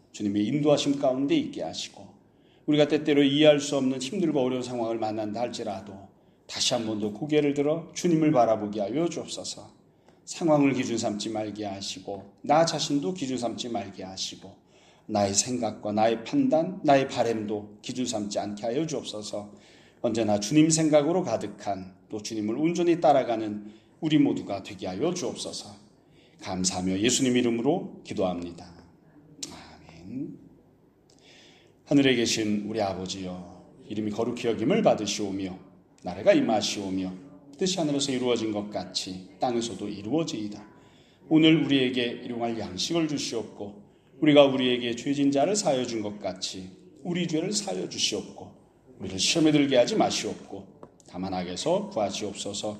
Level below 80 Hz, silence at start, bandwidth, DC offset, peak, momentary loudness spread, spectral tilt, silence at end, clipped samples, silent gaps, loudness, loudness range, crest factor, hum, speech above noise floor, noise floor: -66 dBFS; 0.15 s; 13 kHz; under 0.1%; -4 dBFS; 16 LU; -4.5 dB/octave; 0 s; under 0.1%; none; -26 LUFS; 5 LU; 24 dB; none; 34 dB; -60 dBFS